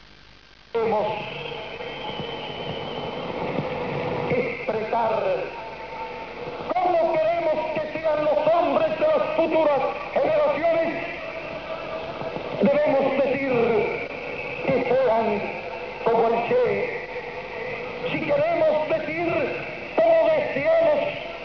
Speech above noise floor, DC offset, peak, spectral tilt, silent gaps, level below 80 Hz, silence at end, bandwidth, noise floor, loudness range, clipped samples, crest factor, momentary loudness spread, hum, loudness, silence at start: 28 dB; 0.2%; -8 dBFS; -7 dB/octave; none; -54 dBFS; 0 s; 5.4 kHz; -50 dBFS; 6 LU; under 0.1%; 14 dB; 12 LU; none; -24 LUFS; 0.75 s